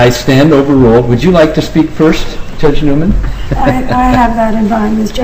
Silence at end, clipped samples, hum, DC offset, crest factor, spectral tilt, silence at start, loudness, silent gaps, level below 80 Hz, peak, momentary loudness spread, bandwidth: 0 s; 0.6%; none; 5%; 8 dB; -6.5 dB/octave; 0 s; -9 LUFS; none; -18 dBFS; 0 dBFS; 7 LU; 16 kHz